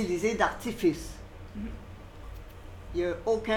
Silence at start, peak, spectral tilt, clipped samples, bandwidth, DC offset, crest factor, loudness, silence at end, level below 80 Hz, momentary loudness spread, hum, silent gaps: 0 s; -12 dBFS; -5 dB/octave; under 0.1%; 18.5 kHz; under 0.1%; 20 dB; -31 LUFS; 0 s; -46 dBFS; 19 LU; none; none